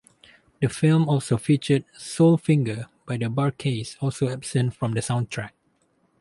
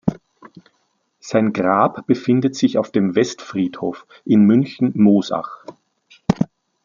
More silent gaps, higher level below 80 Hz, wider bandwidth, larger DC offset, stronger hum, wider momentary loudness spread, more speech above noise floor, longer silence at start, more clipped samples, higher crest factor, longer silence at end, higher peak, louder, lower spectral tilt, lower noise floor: neither; about the same, -58 dBFS vs -54 dBFS; first, 11.5 kHz vs 7.4 kHz; neither; neither; about the same, 12 LU vs 12 LU; second, 44 dB vs 50 dB; first, 0.6 s vs 0.05 s; neither; about the same, 16 dB vs 16 dB; first, 0.7 s vs 0.4 s; second, -6 dBFS vs -2 dBFS; second, -24 LUFS vs -18 LUFS; about the same, -6.5 dB/octave vs -7 dB/octave; about the same, -66 dBFS vs -67 dBFS